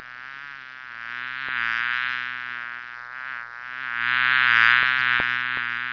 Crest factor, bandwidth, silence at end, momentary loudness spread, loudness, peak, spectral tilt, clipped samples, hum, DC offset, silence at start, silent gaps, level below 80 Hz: 22 dB; 5.4 kHz; 0 s; 20 LU; -21 LUFS; -2 dBFS; -2.5 dB/octave; under 0.1%; none; under 0.1%; 0 s; none; -64 dBFS